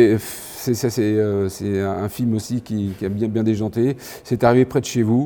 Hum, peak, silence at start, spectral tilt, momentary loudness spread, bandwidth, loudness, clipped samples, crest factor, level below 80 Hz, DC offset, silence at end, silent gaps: none; -2 dBFS; 0 s; -6.5 dB/octave; 8 LU; over 20 kHz; -21 LUFS; under 0.1%; 18 dB; -52 dBFS; under 0.1%; 0 s; none